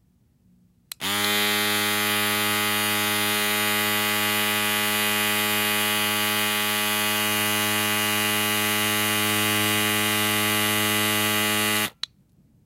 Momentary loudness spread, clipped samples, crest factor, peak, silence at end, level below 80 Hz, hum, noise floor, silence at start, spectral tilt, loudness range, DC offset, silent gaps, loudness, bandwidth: 1 LU; under 0.1%; 14 dB; -10 dBFS; 0.75 s; -62 dBFS; none; -61 dBFS; 1 s; -1.5 dB/octave; 1 LU; under 0.1%; none; -21 LUFS; 16 kHz